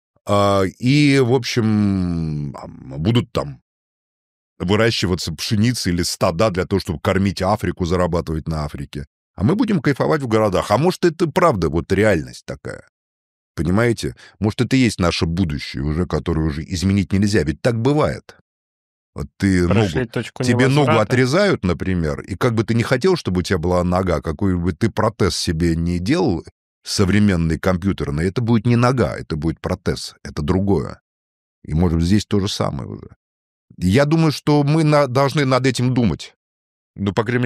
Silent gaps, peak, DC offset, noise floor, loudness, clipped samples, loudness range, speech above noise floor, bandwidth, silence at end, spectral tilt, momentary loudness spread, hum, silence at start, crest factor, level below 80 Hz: 3.62-4.56 s, 9.07-9.34 s, 12.89-13.55 s, 18.41-19.13 s, 26.52-26.81 s, 31.01-31.62 s, 33.16-33.68 s, 36.36-36.94 s; -2 dBFS; under 0.1%; under -90 dBFS; -19 LUFS; under 0.1%; 4 LU; over 72 dB; 15 kHz; 0 s; -6 dB/octave; 10 LU; none; 0.25 s; 18 dB; -38 dBFS